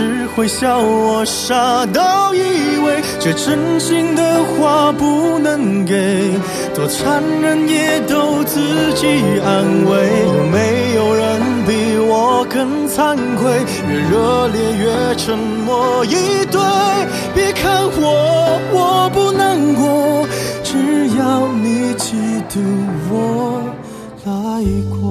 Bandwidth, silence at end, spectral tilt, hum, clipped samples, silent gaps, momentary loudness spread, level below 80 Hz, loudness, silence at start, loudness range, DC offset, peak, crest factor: 14 kHz; 0 s; -5 dB/octave; none; under 0.1%; none; 5 LU; -40 dBFS; -14 LUFS; 0 s; 2 LU; under 0.1%; 0 dBFS; 14 dB